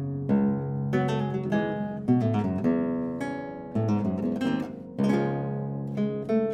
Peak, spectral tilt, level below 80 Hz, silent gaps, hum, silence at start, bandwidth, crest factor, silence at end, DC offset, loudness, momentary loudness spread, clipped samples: -12 dBFS; -8.5 dB/octave; -58 dBFS; none; none; 0 s; 9 kHz; 16 dB; 0 s; under 0.1%; -28 LUFS; 7 LU; under 0.1%